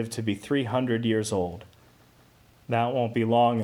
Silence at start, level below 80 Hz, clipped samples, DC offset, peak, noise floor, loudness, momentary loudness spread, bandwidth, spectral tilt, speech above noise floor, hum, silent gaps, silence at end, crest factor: 0 s; -62 dBFS; under 0.1%; under 0.1%; -10 dBFS; -57 dBFS; -26 LUFS; 8 LU; 15.5 kHz; -6 dB/octave; 32 dB; none; none; 0 s; 16 dB